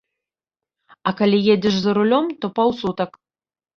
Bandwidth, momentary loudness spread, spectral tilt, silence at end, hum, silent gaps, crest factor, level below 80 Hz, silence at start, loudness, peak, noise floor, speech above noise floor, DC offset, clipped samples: 6.8 kHz; 10 LU; -6.5 dB/octave; 0.7 s; none; none; 18 dB; -58 dBFS; 1.05 s; -19 LUFS; -4 dBFS; -89 dBFS; 71 dB; under 0.1%; under 0.1%